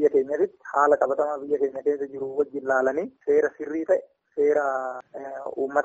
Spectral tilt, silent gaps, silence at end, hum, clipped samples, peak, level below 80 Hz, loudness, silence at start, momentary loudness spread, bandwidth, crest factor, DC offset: -6 dB/octave; none; 0 s; none; under 0.1%; -6 dBFS; -68 dBFS; -25 LUFS; 0 s; 11 LU; 7.8 kHz; 18 dB; under 0.1%